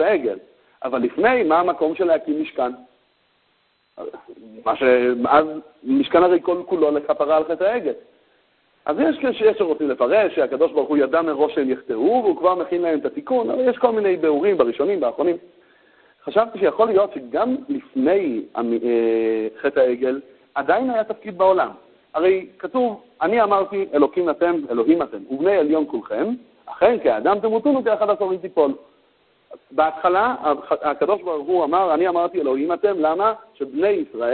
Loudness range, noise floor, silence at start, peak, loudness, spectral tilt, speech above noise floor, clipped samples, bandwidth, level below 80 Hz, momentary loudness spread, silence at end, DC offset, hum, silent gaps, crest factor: 2 LU; -64 dBFS; 0 s; -2 dBFS; -20 LUFS; -10 dB/octave; 45 dB; under 0.1%; 4.5 kHz; -60 dBFS; 9 LU; 0 s; under 0.1%; none; none; 18 dB